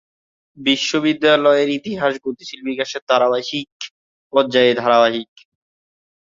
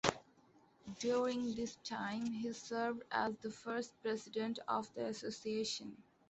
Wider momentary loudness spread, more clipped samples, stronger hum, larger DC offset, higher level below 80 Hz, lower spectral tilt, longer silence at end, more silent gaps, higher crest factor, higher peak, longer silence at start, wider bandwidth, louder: first, 14 LU vs 7 LU; neither; neither; neither; first, -64 dBFS vs -74 dBFS; about the same, -4 dB/octave vs -4 dB/octave; first, 1 s vs 0.3 s; first, 3.02-3.07 s, 3.72-3.80 s, 3.91-4.30 s vs none; second, 18 dB vs 28 dB; first, -2 dBFS vs -14 dBFS; first, 0.6 s vs 0.05 s; about the same, 7.6 kHz vs 8.2 kHz; first, -17 LUFS vs -41 LUFS